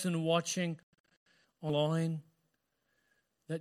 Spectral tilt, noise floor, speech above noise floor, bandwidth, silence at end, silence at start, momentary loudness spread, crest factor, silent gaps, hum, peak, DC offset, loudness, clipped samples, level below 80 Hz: -5 dB/octave; -81 dBFS; 48 dB; 14.5 kHz; 0 s; 0 s; 12 LU; 20 dB; 0.83-0.93 s, 1.00-1.04 s, 1.17-1.26 s; none; -18 dBFS; under 0.1%; -34 LUFS; under 0.1%; -78 dBFS